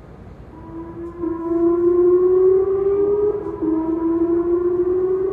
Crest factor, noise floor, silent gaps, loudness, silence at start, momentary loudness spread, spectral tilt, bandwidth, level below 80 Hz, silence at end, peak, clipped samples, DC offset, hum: 12 dB; -39 dBFS; none; -18 LUFS; 0 s; 17 LU; -11 dB/octave; 2.5 kHz; -44 dBFS; 0 s; -8 dBFS; under 0.1%; under 0.1%; none